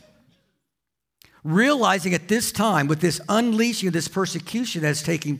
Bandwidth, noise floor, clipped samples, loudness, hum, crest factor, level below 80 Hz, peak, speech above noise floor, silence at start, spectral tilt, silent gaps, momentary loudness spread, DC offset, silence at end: 16 kHz; -84 dBFS; under 0.1%; -22 LUFS; none; 16 dB; -62 dBFS; -6 dBFS; 62 dB; 1.45 s; -4.5 dB/octave; none; 7 LU; under 0.1%; 0 s